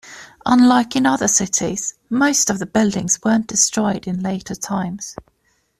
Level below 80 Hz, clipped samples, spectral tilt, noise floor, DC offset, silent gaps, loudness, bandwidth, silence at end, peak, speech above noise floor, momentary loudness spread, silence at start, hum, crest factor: -52 dBFS; under 0.1%; -3.5 dB/octave; -64 dBFS; under 0.1%; none; -17 LUFS; 14 kHz; 0.65 s; -2 dBFS; 46 dB; 12 LU; 0.05 s; none; 16 dB